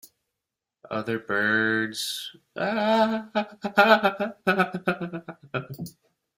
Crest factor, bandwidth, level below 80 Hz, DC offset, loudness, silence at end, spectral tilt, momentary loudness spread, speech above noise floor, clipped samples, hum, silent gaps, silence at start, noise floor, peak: 24 dB; 16 kHz; -68 dBFS; under 0.1%; -25 LUFS; 0.45 s; -4.5 dB/octave; 15 LU; 61 dB; under 0.1%; none; none; 0.9 s; -86 dBFS; -2 dBFS